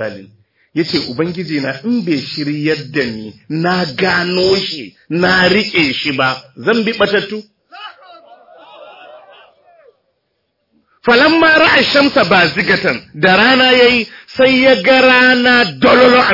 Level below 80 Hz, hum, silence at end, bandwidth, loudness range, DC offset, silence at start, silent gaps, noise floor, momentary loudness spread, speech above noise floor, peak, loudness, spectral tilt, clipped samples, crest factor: -50 dBFS; none; 0 s; 5.8 kHz; 9 LU; under 0.1%; 0 s; none; -67 dBFS; 14 LU; 55 dB; 0 dBFS; -11 LUFS; -5 dB/octave; under 0.1%; 14 dB